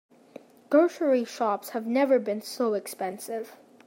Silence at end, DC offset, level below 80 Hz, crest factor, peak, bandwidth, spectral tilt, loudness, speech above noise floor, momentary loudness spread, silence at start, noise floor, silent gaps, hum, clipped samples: 0.3 s; under 0.1%; -86 dBFS; 18 dB; -10 dBFS; 16.5 kHz; -4.5 dB/octave; -27 LUFS; 24 dB; 12 LU; 0.7 s; -50 dBFS; none; none; under 0.1%